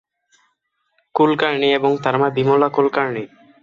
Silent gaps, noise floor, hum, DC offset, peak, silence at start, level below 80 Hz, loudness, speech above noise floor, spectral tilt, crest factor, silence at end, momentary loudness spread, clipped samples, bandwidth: none; -70 dBFS; none; under 0.1%; -2 dBFS; 1.15 s; -62 dBFS; -17 LUFS; 53 dB; -7 dB/octave; 16 dB; 0.35 s; 10 LU; under 0.1%; 7.2 kHz